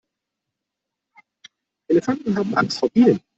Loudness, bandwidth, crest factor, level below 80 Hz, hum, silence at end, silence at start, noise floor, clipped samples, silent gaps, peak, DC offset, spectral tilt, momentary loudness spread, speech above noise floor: -20 LUFS; 8 kHz; 18 dB; -62 dBFS; none; 0.2 s; 1.9 s; -83 dBFS; under 0.1%; none; -4 dBFS; under 0.1%; -6.5 dB/octave; 6 LU; 64 dB